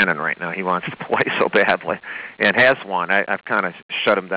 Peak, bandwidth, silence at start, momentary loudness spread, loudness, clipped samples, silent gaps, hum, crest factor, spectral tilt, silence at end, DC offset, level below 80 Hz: -6 dBFS; 4 kHz; 0 s; 9 LU; -19 LUFS; under 0.1%; 3.82-3.89 s; none; 14 dB; -8 dB/octave; 0 s; under 0.1%; -60 dBFS